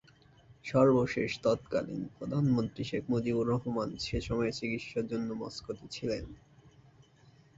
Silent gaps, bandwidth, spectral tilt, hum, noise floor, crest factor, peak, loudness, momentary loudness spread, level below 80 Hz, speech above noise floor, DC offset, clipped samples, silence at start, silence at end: none; 8 kHz; -6.5 dB/octave; none; -61 dBFS; 20 dB; -12 dBFS; -32 LUFS; 13 LU; -54 dBFS; 29 dB; under 0.1%; under 0.1%; 0.5 s; 1.2 s